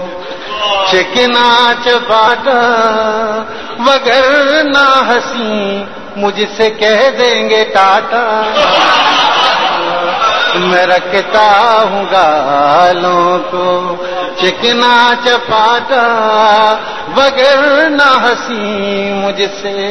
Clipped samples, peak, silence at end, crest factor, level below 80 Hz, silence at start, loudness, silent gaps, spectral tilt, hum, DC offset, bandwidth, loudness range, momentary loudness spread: 0.4%; 0 dBFS; 0 s; 10 dB; -48 dBFS; 0 s; -9 LUFS; none; -3 dB/octave; none; 2%; 11 kHz; 2 LU; 8 LU